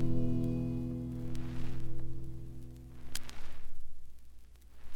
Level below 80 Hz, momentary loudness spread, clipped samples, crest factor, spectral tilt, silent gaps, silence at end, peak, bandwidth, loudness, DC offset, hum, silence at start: -44 dBFS; 26 LU; under 0.1%; 14 dB; -7 dB/octave; none; 0 s; -18 dBFS; 13.5 kHz; -40 LUFS; under 0.1%; none; 0 s